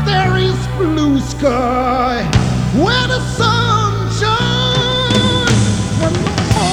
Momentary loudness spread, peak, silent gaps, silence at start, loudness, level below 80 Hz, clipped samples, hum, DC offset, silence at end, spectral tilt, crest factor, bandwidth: 4 LU; 0 dBFS; none; 0 s; -14 LUFS; -28 dBFS; under 0.1%; none; under 0.1%; 0 s; -5 dB/octave; 14 dB; 13 kHz